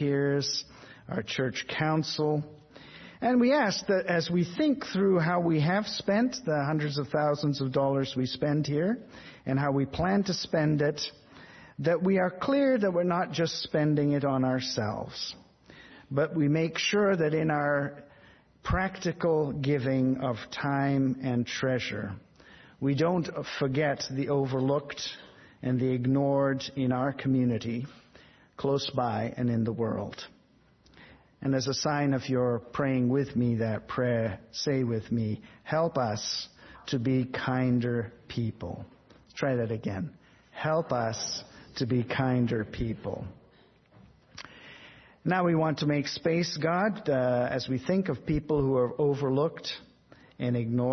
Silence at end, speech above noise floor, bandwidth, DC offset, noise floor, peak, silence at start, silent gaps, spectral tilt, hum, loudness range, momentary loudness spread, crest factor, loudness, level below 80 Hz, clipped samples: 0 s; 34 dB; 6.4 kHz; under 0.1%; -62 dBFS; -12 dBFS; 0 s; none; -6 dB/octave; none; 5 LU; 11 LU; 16 dB; -29 LUFS; -56 dBFS; under 0.1%